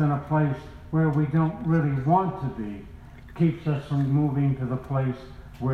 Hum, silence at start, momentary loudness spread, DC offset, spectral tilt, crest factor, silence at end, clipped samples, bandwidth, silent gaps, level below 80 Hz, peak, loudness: none; 0 s; 13 LU; under 0.1%; -10 dB/octave; 16 dB; 0 s; under 0.1%; 4.7 kHz; none; -48 dBFS; -8 dBFS; -25 LUFS